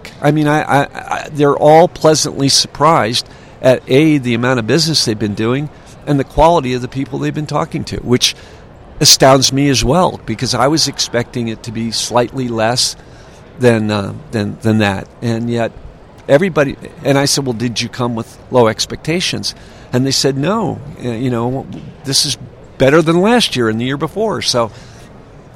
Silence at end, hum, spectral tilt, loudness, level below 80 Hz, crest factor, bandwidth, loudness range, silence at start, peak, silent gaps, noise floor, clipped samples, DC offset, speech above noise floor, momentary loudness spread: 0.15 s; none; -4 dB/octave; -14 LUFS; -38 dBFS; 14 dB; over 20 kHz; 5 LU; 0 s; 0 dBFS; none; -37 dBFS; 0.2%; under 0.1%; 24 dB; 11 LU